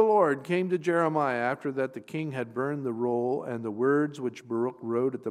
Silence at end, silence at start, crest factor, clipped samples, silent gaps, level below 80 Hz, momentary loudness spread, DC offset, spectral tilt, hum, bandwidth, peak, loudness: 0 s; 0 s; 18 dB; under 0.1%; none; -80 dBFS; 8 LU; under 0.1%; -7.5 dB/octave; none; 11 kHz; -10 dBFS; -29 LUFS